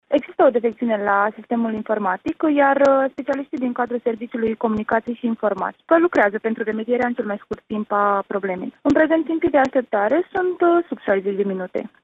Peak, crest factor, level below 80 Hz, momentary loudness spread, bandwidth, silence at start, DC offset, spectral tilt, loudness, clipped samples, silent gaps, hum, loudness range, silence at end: -4 dBFS; 16 dB; -58 dBFS; 8 LU; 7.8 kHz; 0.1 s; under 0.1%; -7.5 dB/octave; -20 LUFS; under 0.1%; none; none; 2 LU; 0.15 s